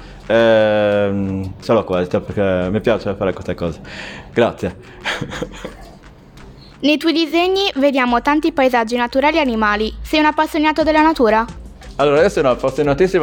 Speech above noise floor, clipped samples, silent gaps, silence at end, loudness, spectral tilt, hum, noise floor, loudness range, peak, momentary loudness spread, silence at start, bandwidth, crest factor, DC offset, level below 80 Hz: 25 dB; under 0.1%; none; 0 s; -16 LUFS; -5.5 dB/octave; none; -41 dBFS; 7 LU; -2 dBFS; 13 LU; 0 s; 17.5 kHz; 16 dB; under 0.1%; -38 dBFS